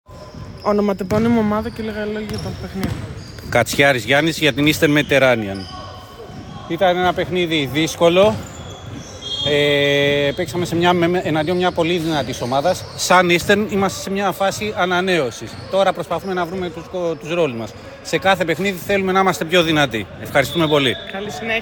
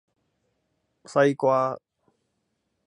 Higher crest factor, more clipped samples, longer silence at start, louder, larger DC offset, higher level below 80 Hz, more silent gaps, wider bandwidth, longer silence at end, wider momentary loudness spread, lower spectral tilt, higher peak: about the same, 18 dB vs 20 dB; neither; second, 0.1 s vs 1.1 s; first, -18 LUFS vs -23 LUFS; neither; first, -44 dBFS vs -78 dBFS; neither; first, 18 kHz vs 10.5 kHz; second, 0 s vs 1.1 s; first, 16 LU vs 10 LU; second, -4.5 dB/octave vs -6.5 dB/octave; first, 0 dBFS vs -8 dBFS